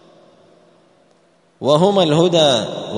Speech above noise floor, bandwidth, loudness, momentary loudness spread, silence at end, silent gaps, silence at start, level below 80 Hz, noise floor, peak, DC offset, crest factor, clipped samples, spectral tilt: 42 dB; 11 kHz; -15 LUFS; 6 LU; 0 s; none; 1.6 s; -62 dBFS; -55 dBFS; 0 dBFS; under 0.1%; 18 dB; under 0.1%; -5.5 dB/octave